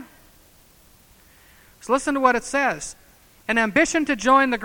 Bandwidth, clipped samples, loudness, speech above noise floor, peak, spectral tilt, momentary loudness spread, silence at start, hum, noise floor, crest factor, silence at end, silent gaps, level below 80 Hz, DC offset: 19 kHz; under 0.1%; -20 LUFS; 33 dB; -2 dBFS; -3 dB/octave; 16 LU; 0 s; none; -53 dBFS; 20 dB; 0 s; none; -52 dBFS; under 0.1%